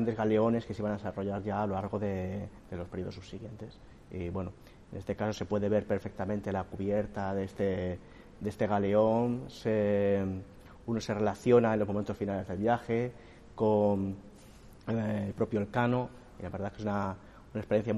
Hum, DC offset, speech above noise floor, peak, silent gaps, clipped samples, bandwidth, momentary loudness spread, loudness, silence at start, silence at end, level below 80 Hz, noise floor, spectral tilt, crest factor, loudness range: none; under 0.1%; 22 dB; -12 dBFS; none; under 0.1%; 12 kHz; 16 LU; -32 LUFS; 0 s; 0 s; -58 dBFS; -53 dBFS; -8 dB/octave; 20 dB; 7 LU